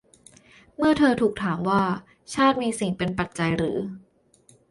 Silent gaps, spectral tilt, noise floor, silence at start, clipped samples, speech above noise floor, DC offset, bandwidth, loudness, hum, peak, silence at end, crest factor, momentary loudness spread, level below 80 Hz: none; -5.5 dB/octave; -58 dBFS; 0.8 s; under 0.1%; 35 dB; under 0.1%; 11.5 kHz; -24 LUFS; none; -6 dBFS; 0.7 s; 18 dB; 13 LU; -52 dBFS